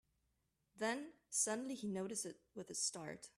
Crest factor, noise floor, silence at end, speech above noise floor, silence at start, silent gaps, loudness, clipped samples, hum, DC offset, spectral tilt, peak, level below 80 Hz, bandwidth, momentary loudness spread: 22 dB; -84 dBFS; 0.1 s; 40 dB; 0.75 s; none; -42 LUFS; under 0.1%; none; under 0.1%; -2.5 dB/octave; -24 dBFS; -84 dBFS; 14.5 kHz; 10 LU